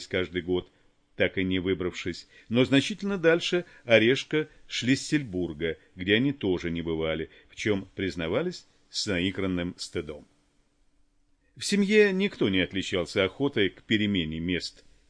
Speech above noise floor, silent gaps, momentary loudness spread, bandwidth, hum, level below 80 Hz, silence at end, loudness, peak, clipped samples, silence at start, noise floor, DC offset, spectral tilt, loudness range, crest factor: 39 dB; none; 12 LU; 10.5 kHz; none; -54 dBFS; 0.4 s; -27 LUFS; -4 dBFS; under 0.1%; 0 s; -66 dBFS; under 0.1%; -5 dB/octave; 6 LU; 22 dB